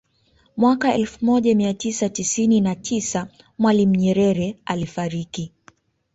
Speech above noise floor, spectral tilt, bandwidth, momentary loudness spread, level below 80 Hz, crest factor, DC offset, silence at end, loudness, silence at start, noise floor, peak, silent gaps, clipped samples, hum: 41 dB; -5.5 dB/octave; 8 kHz; 11 LU; -54 dBFS; 16 dB; under 0.1%; 0.7 s; -20 LUFS; 0.55 s; -60 dBFS; -6 dBFS; none; under 0.1%; none